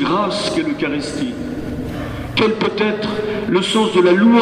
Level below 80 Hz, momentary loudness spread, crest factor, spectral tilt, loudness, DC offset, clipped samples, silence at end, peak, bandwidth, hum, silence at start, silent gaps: -40 dBFS; 12 LU; 16 dB; -5.5 dB/octave; -18 LUFS; under 0.1%; under 0.1%; 0 s; -2 dBFS; 12 kHz; none; 0 s; none